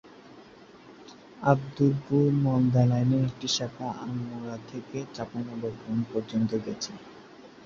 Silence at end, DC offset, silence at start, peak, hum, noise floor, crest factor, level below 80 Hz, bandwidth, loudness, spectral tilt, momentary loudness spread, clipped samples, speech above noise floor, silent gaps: 0 s; under 0.1%; 0.05 s; -6 dBFS; none; -51 dBFS; 22 dB; -60 dBFS; 7.6 kHz; -28 LUFS; -6.5 dB/octave; 15 LU; under 0.1%; 24 dB; none